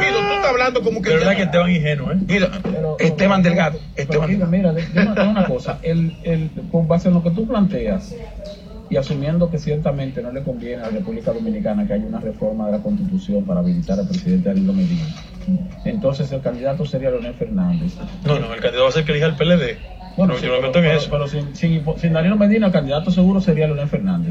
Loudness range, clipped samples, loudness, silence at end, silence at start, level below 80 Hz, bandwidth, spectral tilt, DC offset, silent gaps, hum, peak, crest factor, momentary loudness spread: 5 LU; under 0.1%; -19 LUFS; 0 s; 0 s; -38 dBFS; 7.6 kHz; -7.5 dB/octave; under 0.1%; none; none; -2 dBFS; 16 dB; 10 LU